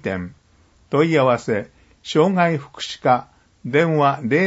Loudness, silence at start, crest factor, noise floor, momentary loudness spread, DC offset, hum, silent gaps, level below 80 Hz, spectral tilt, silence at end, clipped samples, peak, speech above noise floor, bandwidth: -19 LUFS; 0.05 s; 18 dB; -55 dBFS; 16 LU; under 0.1%; none; none; -58 dBFS; -6.5 dB/octave; 0 s; under 0.1%; -2 dBFS; 37 dB; 8 kHz